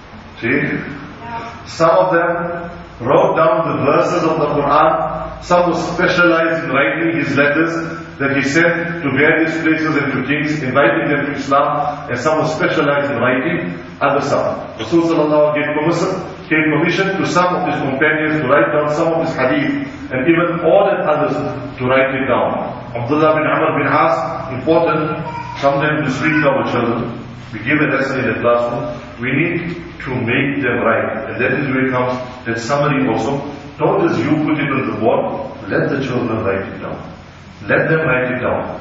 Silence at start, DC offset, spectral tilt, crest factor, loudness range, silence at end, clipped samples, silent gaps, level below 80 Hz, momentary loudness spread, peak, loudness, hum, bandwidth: 0 s; under 0.1%; -6.5 dB/octave; 16 dB; 3 LU; 0 s; under 0.1%; none; -46 dBFS; 11 LU; 0 dBFS; -16 LUFS; none; 8 kHz